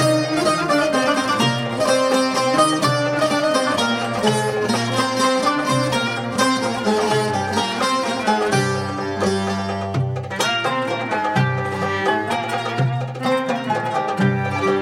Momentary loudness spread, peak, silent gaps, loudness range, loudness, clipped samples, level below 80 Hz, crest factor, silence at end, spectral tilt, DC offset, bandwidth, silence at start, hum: 5 LU; -2 dBFS; none; 3 LU; -19 LUFS; under 0.1%; -58 dBFS; 16 dB; 0 s; -4.5 dB/octave; under 0.1%; 16 kHz; 0 s; none